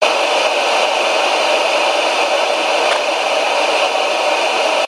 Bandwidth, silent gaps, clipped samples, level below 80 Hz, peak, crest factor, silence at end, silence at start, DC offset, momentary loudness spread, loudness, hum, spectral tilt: 16 kHz; none; under 0.1%; -72 dBFS; 0 dBFS; 14 dB; 0 s; 0 s; under 0.1%; 1 LU; -14 LUFS; none; 0.5 dB/octave